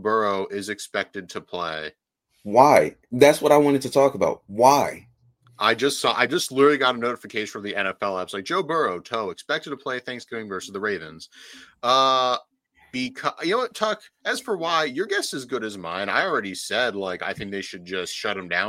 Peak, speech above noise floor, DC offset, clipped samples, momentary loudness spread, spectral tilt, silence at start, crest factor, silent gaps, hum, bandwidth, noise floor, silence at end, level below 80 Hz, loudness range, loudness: 0 dBFS; 34 dB; under 0.1%; under 0.1%; 14 LU; -3.5 dB/octave; 0 s; 22 dB; none; none; 16.5 kHz; -57 dBFS; 0 s; -64 dBFS; 8 LU; -23 LUFS